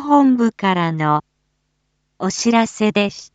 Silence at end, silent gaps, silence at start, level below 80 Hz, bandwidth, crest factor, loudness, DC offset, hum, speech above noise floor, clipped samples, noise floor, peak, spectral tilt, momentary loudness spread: 0.1 s; none; 0 s; -60 dBFS; 9 kHz; 16 dB; -17 LUFS; under 0.1%; none; 53 dB; under 0.1%; -69 dBFS; -2 dBFS; -5 dB/octave; 8 LU